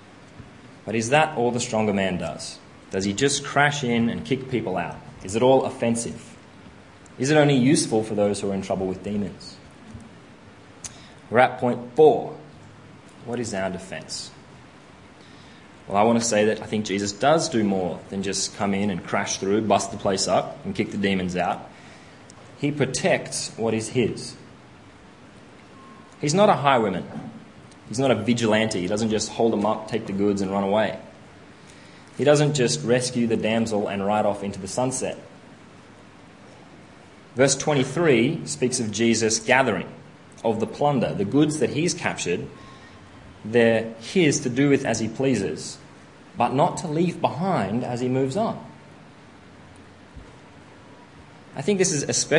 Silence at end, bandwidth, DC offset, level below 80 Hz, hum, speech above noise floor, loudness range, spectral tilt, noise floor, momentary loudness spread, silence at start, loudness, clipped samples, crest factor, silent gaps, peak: 0 s; 11 kHz; under 0.1%; -58 dBFS; none; 25 dB; 6 LU; -4.5 dB/octave; -47 dBFS; 16 LU; 0.15 s; -23 LUFS; under 0.1%; 24 dB; none; 0 dBFS